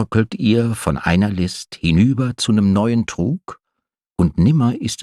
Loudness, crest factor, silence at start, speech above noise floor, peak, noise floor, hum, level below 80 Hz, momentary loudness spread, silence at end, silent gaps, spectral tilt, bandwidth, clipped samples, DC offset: -17 LUFS; 16 dB; 0 s; 63 dB; -2 dBFS; -79 dBFS; none; -38 dBFS; 8 LU; 0 s; none; -6.5 dB/octave; 13 kHz; under 0.1%; under 0.1%